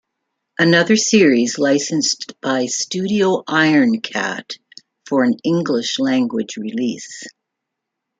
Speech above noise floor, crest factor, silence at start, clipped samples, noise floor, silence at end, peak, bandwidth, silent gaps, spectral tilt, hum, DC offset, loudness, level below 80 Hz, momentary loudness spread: 63 dB; 16 dB; 0.6 s; under 0.1%; -79 dBFS; 0.9 s; -2 dBFS; 9.4 kHz; none; -4 dB/octave; none; under 0.1%; -17 LUFS; -64 dBFS; 16 LU